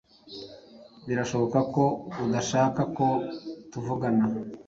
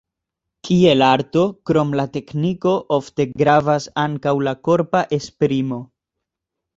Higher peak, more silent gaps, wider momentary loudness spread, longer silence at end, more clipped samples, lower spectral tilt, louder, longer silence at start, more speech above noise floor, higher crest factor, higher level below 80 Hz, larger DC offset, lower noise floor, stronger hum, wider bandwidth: second, -10 dBFS vs -2 dBFS; neither; first, 18 LU vs 9 LU; second, 0.05 s vs 0.9 s; neither; about the same, -6 dB/octave vs -6.5 dB/octave; second, -27 LUFS vs -18 LUFS; second, 0.25 s vs 0.65 s; second, 24 dB vs 65 dB; about the same, 18 dB vs 18 dB; second, -60 dBFS vs -54 dBFS; neither; second, -50 dBFS vs -82 dBFS; neither; about the same, 7.8 kHz vs 7.8 kHz